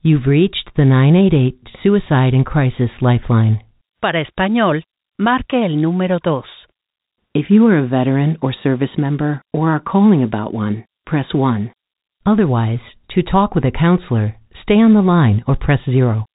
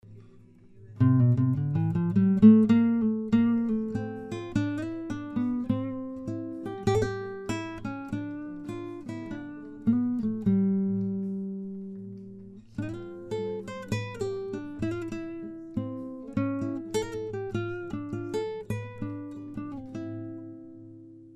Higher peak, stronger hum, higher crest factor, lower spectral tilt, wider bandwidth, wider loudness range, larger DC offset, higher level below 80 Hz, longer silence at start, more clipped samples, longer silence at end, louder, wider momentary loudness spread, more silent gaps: first, -2 dBFS vs -6 dBFS; neither; second, 14 dB vs 22 dB; second, -7 dB/octave vs -8.5 dB/octave; second, 4 kHz vs 10 kHz; second, 4 LU vs 12 LU; neither; first, -38 dBFS vs -56 dBFS; about the same, 0.05 s vs 0.05 s; neither; about the same, 0.1 s vs 0 s; first, -15 LUFS vs -29 LUFS; second, 11 LU vs 15 LU; neither